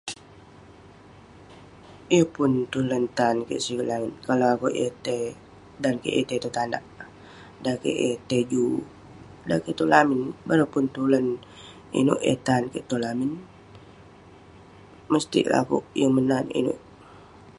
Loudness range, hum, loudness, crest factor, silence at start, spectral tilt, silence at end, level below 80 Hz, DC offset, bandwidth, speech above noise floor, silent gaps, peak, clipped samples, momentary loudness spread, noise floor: 5 LU; none; -25 LUFS; 24 dB; 0.05 s; -5.5 dB/octave; 0.1 s; -60 dBFS; under 0.1%; 11.5 kHz; 25 dB; none; -2 dBFS; under 0.1%; 12 LU; -49 dBFS